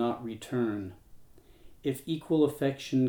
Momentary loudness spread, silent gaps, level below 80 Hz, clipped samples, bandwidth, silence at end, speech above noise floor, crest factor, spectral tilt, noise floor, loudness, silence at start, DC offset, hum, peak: 11 LU; none; -62 dBFS; under 0.1%; over 20 kHz; 0 s; 24 dB; 16 dB; -7 dB/octave; -53 dBFS; -31 LUFS; 0 s; under 0.1%; none; -14 dBFS